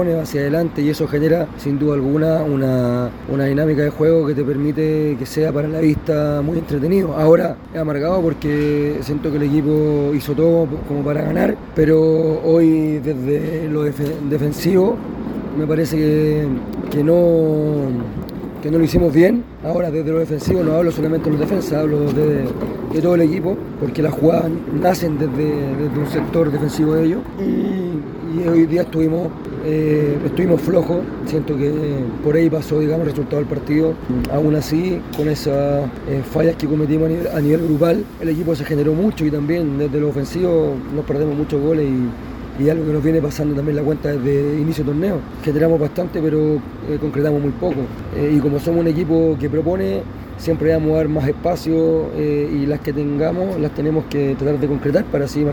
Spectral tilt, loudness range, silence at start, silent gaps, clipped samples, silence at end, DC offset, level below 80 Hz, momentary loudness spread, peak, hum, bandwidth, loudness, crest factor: -8 dB/octave; 2 LU; 0 s; none; under 0.1%; 0 s; under 0.1%; -38 dBFS; 7 LU; 0 dBFS; none; 19 kHz; -18 LUFS; 16 dB